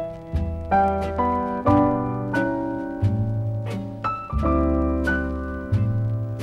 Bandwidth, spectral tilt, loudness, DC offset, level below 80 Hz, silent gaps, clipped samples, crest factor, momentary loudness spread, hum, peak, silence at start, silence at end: 7.4 kHz; -9 dB/octave; -24 LUFS; under 0.1%; -32 dBFS; none; under 0.1%; 16 dB; 8 LU; none; -8 dBFS; 0 s; 0 s